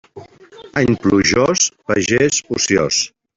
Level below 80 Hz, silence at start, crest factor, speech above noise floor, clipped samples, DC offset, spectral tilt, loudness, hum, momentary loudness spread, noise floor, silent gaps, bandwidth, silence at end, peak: -46 dBFS; 0.15 s; 16 dB; 25 dB; under 0.1%; under 0.1%; -3.5 dB/octave; -15 LUFS; none; 5 LU; -41 dBFS; none; 8 kHz; 0.3 s; -2 dBFS